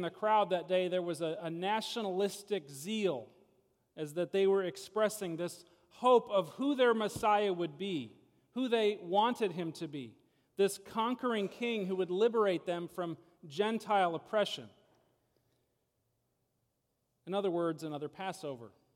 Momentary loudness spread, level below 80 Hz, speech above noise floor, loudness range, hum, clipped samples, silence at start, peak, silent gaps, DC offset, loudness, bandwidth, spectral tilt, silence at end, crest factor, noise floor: 13 LU; -78 dBFS; 48 dB; 9 LU; none; under 0.1%; 0 s; -16 dBFS; none; under 0.1%; -34 LUFS; 16.5 kHz; -5 dB/octave; 0.25 s; 20 dB; -81 dBFS